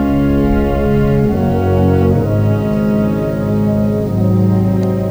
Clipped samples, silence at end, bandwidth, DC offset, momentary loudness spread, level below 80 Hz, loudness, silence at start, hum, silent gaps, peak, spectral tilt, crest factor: under 0.1%; 0 s; over 20 kHz; under 0.1%; 3 LU; -26 dBFS; -14 LUFS; 0 s; none; none; -2 dBFS; -9.5 dB/octave; 10 dB